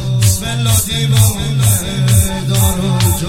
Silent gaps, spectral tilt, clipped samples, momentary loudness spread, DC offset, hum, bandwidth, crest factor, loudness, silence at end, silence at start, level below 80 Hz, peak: none; -4.5 dB/octave; under 0.1%; 2 LU; under 0.1%; none; 16.5 kHz; 12 dB; -13 LUFS; 0 s; 0 s; -28 dBFS; 0 dBFS